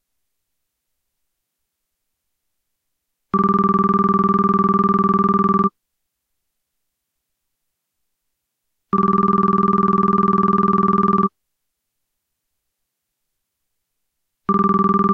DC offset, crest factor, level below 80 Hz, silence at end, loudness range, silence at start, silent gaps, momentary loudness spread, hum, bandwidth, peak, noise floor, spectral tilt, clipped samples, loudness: under 0.1%; 14 dB; -50 dBFS; 0 s; 9 LU; 3.35 s; none; 4 LU; none; 4.8 kHz; -6 dBFS; -78 dBFS; -10.5 dB/octave; under 0.1%; -17 LUFS